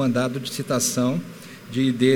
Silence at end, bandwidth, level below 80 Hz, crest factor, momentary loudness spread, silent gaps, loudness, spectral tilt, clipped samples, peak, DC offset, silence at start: 0 s; 18.5 kHz; -64 dBFS; 18 dB; 13 LU; none; -23 LUFS; -4.5 dB/octave; under 0.1%; -4 dBFS; under 0.1%; 0 s